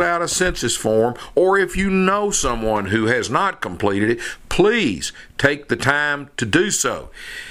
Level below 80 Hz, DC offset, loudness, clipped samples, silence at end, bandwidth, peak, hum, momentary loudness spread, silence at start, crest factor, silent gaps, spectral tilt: -38 dBFS; under 0.1%; -19 LUFS; under 0.1%; 0 s; 16 kHz; 0 dBFS; none; 7 LU; 0 s; 18 dB; none; -3.5 dB/octave